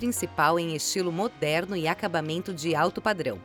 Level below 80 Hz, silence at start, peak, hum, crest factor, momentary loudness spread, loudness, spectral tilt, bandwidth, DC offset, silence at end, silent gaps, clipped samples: -60 dBFS; 0 s; -10 dBFS; none; 18 dB; 5 LU; -27 LUFS; -4 dB/octave; over 20 kHz; under 0.1%; 0 s; none; under 0.1%